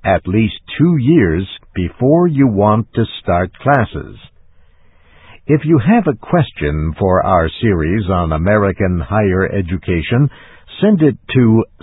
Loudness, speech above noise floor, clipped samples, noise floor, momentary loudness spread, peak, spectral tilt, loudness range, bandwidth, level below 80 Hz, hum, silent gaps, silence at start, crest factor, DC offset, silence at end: -14 LUFS; 33 dB; under 0.1%; -46 dBFS; 8 LU; 0 dBFS; -12 dB/octave; 3 LU; 4.1 kHz; -30 dBFS; none; none; 0.05 s; 14 dB; under 0.1%; 0.2 s